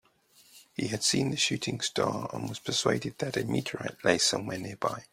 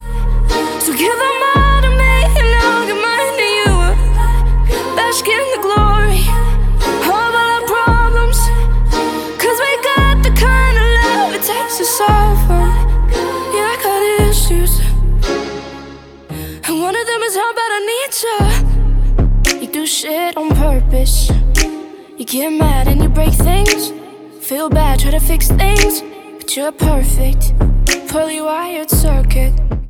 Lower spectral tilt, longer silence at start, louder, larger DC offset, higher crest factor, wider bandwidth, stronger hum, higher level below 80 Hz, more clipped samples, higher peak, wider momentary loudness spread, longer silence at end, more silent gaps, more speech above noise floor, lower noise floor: about the same, -3.5 dB/octave vs -4.5 dB/octave; first, 0.55 s vs 0 s; second, -29 LUFS vs -14 LUFS; neither; first, 24 dB vs 12 dB; second, 16 kHz vs 18 kHz; neither; second, -64 dBFS vs -14 dBFS; neither; second, -8 dBFS vs 0 dBFS; first, 10 LU vs 7 LU; about the same, 0.1 s vs 0 s; neither; first, 32 dB vs 23 dB; first, -62 dBFS vs -34 dBFS